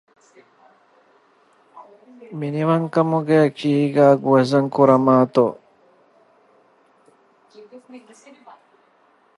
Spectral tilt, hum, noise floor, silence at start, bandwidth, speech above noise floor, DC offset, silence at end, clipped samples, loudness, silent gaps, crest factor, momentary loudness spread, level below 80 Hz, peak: -8 dB/octave; none; -58 dBFS; 1.75 s; 11.5 kHz; 41 dB; under 0.1%; 1.4 s; under 0.1%; -17 LUFS; none; 20 dB; 8 LU; -70 dBFS; -2 dBFS